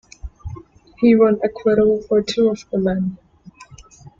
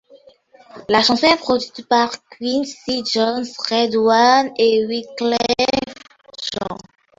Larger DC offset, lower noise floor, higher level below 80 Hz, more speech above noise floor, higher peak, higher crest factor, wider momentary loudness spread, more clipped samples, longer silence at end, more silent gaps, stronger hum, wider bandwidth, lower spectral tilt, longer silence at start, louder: neither; second, -44 dBFS vs -49 dBFS; first, -44 dBFS vs -54 dBFS; second, 28 dB vs 32 dB; about the same, -2 dBFS vs -2 dBFS; about the same, 16 dB vs 18 dB; first, 22 LU vs 14 LU; neither; second, 0.1 s vs 0.4 s; neither; neither; about the same, 7.6 kHz vs 8 kHz; first, -7 dB/octave vs -3.5 dB/octave; second, 0.25 s vs 0.75 s; about the same, -17 LUFS vs -18 LUFS